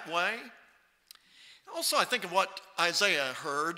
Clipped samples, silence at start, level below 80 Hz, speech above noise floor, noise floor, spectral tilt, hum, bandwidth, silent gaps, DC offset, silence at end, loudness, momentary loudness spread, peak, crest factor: under 0.1%; 0 s; -82 dBFS; 29 dB; -60 dBFS; -1 dB/octave; none; 16 kHz; none; under 0.1%; 0 s; -29 LUFS; 12 LU; -10 dBFS; 24 dB